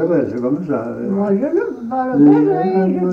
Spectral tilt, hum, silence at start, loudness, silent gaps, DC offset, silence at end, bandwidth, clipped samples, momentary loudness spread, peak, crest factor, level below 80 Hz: -10.5 dB/octave; none; 0 s; -16 LUFS; none; under 0.1%; 0 s; 4.4 kHz; under 0.1%; 10 LU; -2 dBFS; 14 dB; -56 dBFS